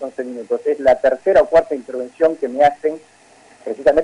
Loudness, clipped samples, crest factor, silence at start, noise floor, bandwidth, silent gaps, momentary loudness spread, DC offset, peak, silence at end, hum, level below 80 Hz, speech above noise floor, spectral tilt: -17 LUFS; under 0.1%; 12 dB; 0 s; -48 dBFS; 10.5 kHz; none; 14 LU; under 0.1%; -4 dBFS; 0 s; none; -48 dBFS; 32 dB; -5.5 dB/octave